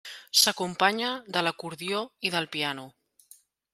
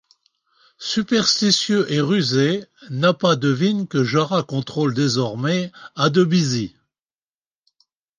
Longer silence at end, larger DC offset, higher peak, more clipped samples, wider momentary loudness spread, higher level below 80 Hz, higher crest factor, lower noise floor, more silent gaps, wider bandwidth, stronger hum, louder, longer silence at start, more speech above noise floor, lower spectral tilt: second, 0.85 s vs 1.5 s; neither; second, -6 dBFS vs -2 dBFS; neither; about the same, 10 LU vs 9 LU; second, -76 dBFS vs -62 dBFS; first, 24 dB vs 18 dB; second, -58 dBFS vs under -90 dBFS; neither; first, 16 kHz vs 9.8 kHz; neither; second, -26 LUFS vs -19 LUFS; second, 0.05 s vs 0.8 s; second, 29 dB vs over 71 dB; second, -1.5 dB/octave vs -5 dB/octave